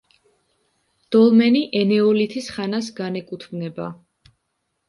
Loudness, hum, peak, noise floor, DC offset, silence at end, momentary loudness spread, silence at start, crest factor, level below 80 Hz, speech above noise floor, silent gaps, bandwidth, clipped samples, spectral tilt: -19 LUFS; none; -4 dBFS; -74 dBFS; under 0.1%; 0.95 s; 16 LU; 1.1 s; 16 dB; -66 dBFS; 55 dB; none; 11.5 kHz; under 0.1%; -6.5 dB/octave